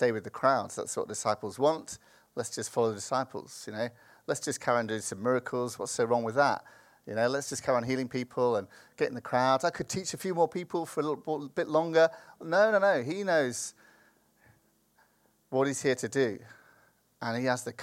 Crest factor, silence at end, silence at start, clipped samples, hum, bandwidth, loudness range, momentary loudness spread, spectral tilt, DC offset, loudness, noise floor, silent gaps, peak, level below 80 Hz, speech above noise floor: 20 dB; 0 s; 0 s; under 0.1%; none; 16 kHz; 5 LU; 12 LU; -4 dB/octave; under 0.1%; -30 LUFS; -68 dBFS; none; -10 dBFS; -72 dBFS; 39 dB